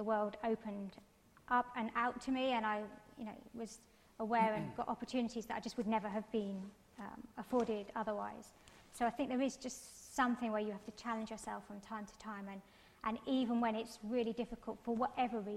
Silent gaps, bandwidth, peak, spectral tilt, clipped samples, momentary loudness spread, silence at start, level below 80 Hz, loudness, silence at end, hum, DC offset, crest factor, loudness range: none; 15 kHz; -22 dBFS; -5 dB/octave; under 0.1%; 14 LU; 0 s; -70 dBFS; -40 LUFS; 0 s; none; under 0.1%; 18 dB; 3 LU